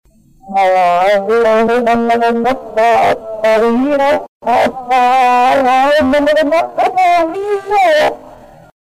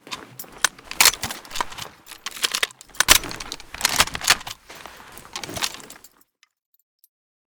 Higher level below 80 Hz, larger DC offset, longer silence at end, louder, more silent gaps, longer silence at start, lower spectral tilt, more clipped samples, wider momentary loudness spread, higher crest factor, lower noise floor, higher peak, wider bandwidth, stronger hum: about the same, -44 dBFS vs -46 dBFS; first, 0.3% vs under 0.1%; second, 0.5 s vs 1.55 s; first, -12 LUFS vs -20 LUFS; first, 4.28-4.40 s vs none; first, 0.45 s vs 0.05 s; first, -4.5 dB/octave vs 0.5 dB/octave; neither; second, 6 LU vs 23 LU; second, 6 dB vs 26 dB; second, -37 dBFS vs -61 dBFS; second, -6 dBFS vs 0 dBFS; second, 15.5 kHz vs over 20 kHz; neither